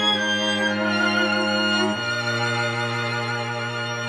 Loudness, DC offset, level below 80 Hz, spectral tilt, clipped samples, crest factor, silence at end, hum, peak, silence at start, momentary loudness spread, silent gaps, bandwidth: -22 LUFS; under 0.1%; -76 dBFS; -4 dB/octave; under 0.1%; 14 dB; 0 s; none; -10 dBFS; 0 s; 6 LU; none; 13.5 kHz